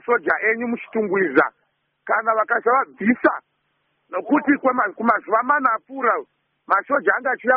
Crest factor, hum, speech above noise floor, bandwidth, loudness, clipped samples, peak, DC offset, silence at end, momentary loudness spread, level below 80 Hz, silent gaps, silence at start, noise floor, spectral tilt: 18 dB; none; 50 dB; 3.9 kHz; -20 LUFS; under 0.1%; -2 dBFS; under 0.1%; 0 s; 6 LU; -68 dBFS; none; 0.05 s; -70 dBFS; 1.5 dB/octave